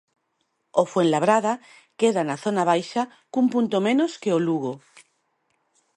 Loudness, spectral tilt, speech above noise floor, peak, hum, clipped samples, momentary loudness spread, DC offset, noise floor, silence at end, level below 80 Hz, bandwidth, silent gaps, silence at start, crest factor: -23 LUFS; -5.5 dB/octave; 51 dB; -4 dBFS; none; under 0.1%; 8 LU; under 0.1%; -74 dBFS; 1.2 s; -74 dBFS; 11.5 kHz; none; 0.75 s; 20 dB